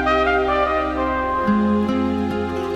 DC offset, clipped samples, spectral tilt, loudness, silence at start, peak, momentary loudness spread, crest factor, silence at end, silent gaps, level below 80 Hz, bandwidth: under 0.1%; under 0.1%; -7 dB/octave; -20 LUFS; 0 s; -6 dBFS; 5 LU; 12 dB; 0 s; none; -36 dBFS; 8.8 kHz